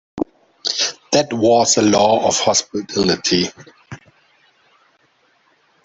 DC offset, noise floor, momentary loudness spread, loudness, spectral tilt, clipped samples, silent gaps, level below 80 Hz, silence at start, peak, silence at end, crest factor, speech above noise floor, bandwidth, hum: under 0.1%; -59 dBFS; 13 LU; -16 LUFS; -3 dB/octave; under 0.1%; none; -54 dBFS; 0.15 s; 0 dBFS; 1.9 s; 18 dB; 43 dB; 8.4 kHz; none